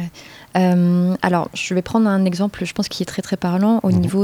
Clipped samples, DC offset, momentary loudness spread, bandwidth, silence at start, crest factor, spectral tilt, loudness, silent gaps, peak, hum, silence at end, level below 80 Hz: under 0.1%; under 0.1%; 8 LU; 13.5 kHz; 0 s; 18 dB; -6.5 dB/octave; -18 LUFS; none; 0 dBFS; none; 0 s; -52 dBFS